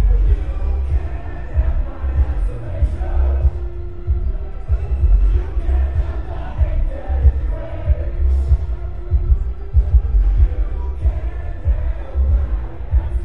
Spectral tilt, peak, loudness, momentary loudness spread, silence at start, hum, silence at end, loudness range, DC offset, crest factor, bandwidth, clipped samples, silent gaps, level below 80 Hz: -9.5 dB/octave; -2 dBFS; -21 LUFS; 9 LU; 0 s; none; 0 s; 2 LU; 4%; 16 dB; 3.5 kHz; under 0.1%; none; -18 dBFS